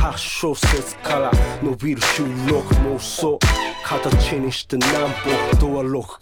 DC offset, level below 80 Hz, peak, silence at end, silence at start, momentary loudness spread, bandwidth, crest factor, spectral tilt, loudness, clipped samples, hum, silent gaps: under 0.1%; -24 dBFS; -4 dBFS; 0.05 s; 0 s; 5 LU; 18.5 kHz; 16 dB; -4.5 dB/octave; -20 LUFS; under 0.1%; none; none